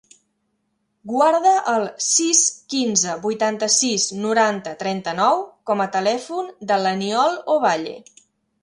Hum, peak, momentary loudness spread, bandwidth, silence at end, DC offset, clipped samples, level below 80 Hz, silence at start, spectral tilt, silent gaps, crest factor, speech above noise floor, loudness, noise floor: none; -2 dBFS; 10 LU; 11.5 kHz; 0.6 s; under 0.1%; under 0.1%; -70 dBFS; 1.05 s; -2 dB/octave; none; 18 dB; 51 dB; -19 LUFS; -71 dBFS